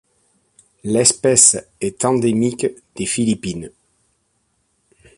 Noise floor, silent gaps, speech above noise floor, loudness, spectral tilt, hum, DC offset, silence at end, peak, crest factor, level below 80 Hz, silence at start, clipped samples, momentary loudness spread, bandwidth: -66 dBFS; none; 49 dB; -16 LUFS; -3.5 dB/octave; none; under 0.1%; 1.5 s; 0 dBFS; 20 dB; -52 dBFS; 0.85 s; under 0.1%; 17 LU; 12.5 kHz